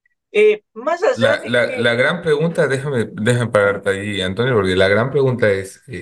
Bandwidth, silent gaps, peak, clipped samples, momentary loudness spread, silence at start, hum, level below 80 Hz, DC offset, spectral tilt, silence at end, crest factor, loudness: 12.5 kHz; none; 0 dBFS; under 0.1%; 7 LU; 0.35 s; none; -56 dBFS; under 0.1%; -5.5 dB/octave; 0 s; 16 dB; -17 LUFS